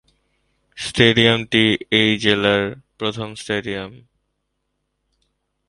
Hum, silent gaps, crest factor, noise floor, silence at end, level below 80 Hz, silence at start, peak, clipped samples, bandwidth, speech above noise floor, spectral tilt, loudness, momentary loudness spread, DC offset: none; none; 20 dB; -74 dBFS; 1.7 s; -50 dBFS; 0.75 s; 0 dBFS; under 0.1%; 11.5 kHz; 56 dB; -5 dB/octave; -17 LUFS; 15 LU; under 0.1%